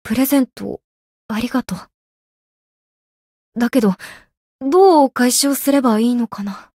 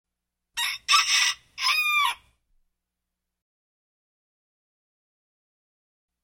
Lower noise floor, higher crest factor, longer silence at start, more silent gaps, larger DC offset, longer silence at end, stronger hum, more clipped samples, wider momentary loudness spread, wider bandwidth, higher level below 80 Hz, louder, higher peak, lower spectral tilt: first, under -90 dBFS vs -84 dBFS; second, 16 dB vs 24 dB; second, 0.05 s vs 0.55 s; first, 0.84-1.29 s, 1.94-3.52 s, 4.37-4.59 s vs none; neither; second, 0.15 s vs 4.1 s; second, none vs 60 Hz at -80 dBFS; neither; first, 18 LU vs 11 LU; about the same, 16 kHz vs 16.5 kHz; first, -54 dBFS vs -70 dBFS; first, -16 LUFS vs -22 LUFS; first, -2 dBFS vs -6 dBFS; first, -4 dB/octave vs 5 dB/octave